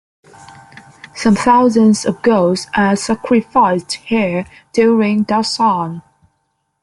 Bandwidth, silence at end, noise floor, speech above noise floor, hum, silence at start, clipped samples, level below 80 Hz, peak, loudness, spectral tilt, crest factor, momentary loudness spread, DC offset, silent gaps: 11.5 kHz; 0.8 s; -67 dBFS; 54 dB; none; 0.5 s; under 0.1%; -52 dBFS; -2 dBFS; -14 LUFS; -5.5 dB/octave; 14 dB; 9 LU; under 0.1%; none